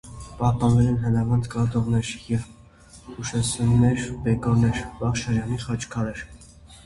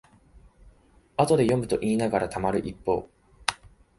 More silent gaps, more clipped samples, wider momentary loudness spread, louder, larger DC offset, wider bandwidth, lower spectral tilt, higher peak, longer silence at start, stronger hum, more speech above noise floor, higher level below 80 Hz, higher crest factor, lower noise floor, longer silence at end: neither; neither; about the same, 11 LU vs 9 LU; about the same, -24 LUFS vs -26 LUFS; neither; about the same, 11.5 kHz vs 11.5 kHz; about the same, -6.5 dB/octave vs -5.5 dB/octave; second, -6 dBFS vs -2 dBFS; second, 0.05 s vs 0.65 s; neither; second, 26 dB vs 33 dB; first, -40 dBFS vs -52 dBFS; second, 18 dB vs 26 dB; second, -49 dBFS vs -58 dBFS; second, 0.05 s vs 0.45 s